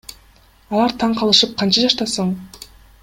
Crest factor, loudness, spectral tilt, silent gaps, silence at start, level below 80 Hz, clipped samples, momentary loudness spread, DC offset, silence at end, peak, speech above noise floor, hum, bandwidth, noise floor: 20 dB; -16 LUFS; -4 dB/octave; none; 0.1 s; -50 dBFS; under 0.1%; 10 LU; under 0.1%; 0.4 s; 0 dBFS; 33 dB; none; 16.5 kHz; -50 dBFS